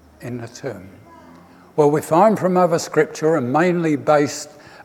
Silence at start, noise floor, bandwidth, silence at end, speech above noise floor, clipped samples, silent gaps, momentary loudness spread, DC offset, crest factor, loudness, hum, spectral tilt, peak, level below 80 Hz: 0.2 s; -45 dBFS; 17 kHz; 0 s; 27 dB; under 0.1%; none; 16 LU; under 0.1%; 16 dB; -17 LUFS; none; -6 dB/octave; -2 dBFS; -62 dBFS